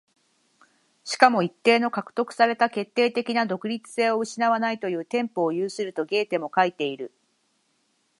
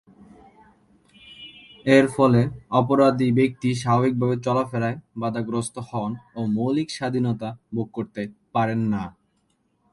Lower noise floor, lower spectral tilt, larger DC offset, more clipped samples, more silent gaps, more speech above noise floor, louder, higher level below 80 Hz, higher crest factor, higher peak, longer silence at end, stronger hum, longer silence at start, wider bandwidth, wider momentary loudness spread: about the same, -70 dBFS vs -68 dBFS; second, -4.5 dB/octave vs -7 dB/octave; neither; neither; neither; about the same, 46 dB vs 46 dB; about the same, -24 LUFS vs -23 LUFS; second, -78 dBFS vs -58 dBFS; about the same, 24 dB vs 22 dB; about the same, -2 dBFS vs -2 dBFS; first, 1.15 s vs 0.85 s; neither; second, 1.05 s vs 1.25 s; about the same, 11.5 kHz vs 11.5 kHz; second, 10 LU vs 13 LU